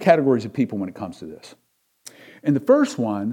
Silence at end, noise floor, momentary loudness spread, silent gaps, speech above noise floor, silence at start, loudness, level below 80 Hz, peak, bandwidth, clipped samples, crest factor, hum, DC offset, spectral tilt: 0 s; -48 dBFS; 24 LU; none; 28 dB; 0 s; -21 LUFS; -68 dBFS; -2 dBFS; 14 kHz; under 0.1%; 18 dB; none; under 0.1%; -7 dB/octave